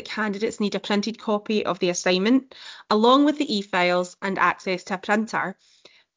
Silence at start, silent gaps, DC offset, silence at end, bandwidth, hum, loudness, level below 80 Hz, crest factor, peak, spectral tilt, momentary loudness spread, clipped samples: 0 s; none; under 0.1%; 0.65 s; 7.6 kHz; none; -23 LUFS; -68 dBFS; 16 dB; -8 dBFS; -4.5 dB/octave; 9 LU; under 0.1%